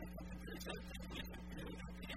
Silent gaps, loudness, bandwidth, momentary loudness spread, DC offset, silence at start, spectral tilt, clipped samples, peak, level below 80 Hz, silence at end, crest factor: none; -50 LUFS; 16 kHz; 3 LU; under 0.1%; 0 s; -5 dB/octave; under 0.1%; -28 dBFS; -54 dBFS; 0 s; 20 dB